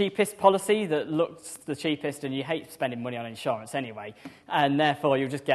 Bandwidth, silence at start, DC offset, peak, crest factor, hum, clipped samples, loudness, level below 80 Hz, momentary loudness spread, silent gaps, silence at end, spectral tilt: 13 kHz; 0 s; under 0.1%; -4 dBFS; 22 dB; none; under 0.1%; -27 LUFS; -72 dBFS; 13 LU; none; 0 s; -5 dB/octave